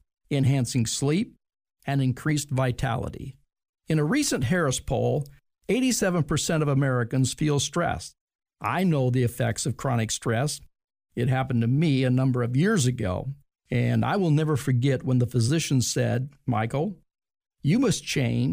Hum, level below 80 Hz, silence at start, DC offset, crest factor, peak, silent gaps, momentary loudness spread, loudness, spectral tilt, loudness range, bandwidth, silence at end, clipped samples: none; -50 dBFS; 0.3 s; under 0.1%; 12 dB; -12 dBFS; 3.69-3.73 s, 8.21-8.28 s, 8.35-8.39 s, 10.84-10.88 s; 8 LU; -25 LUFS; -5.5 dB/octave; 3 LU; 15.5 kHz; 0 s; under 0.1%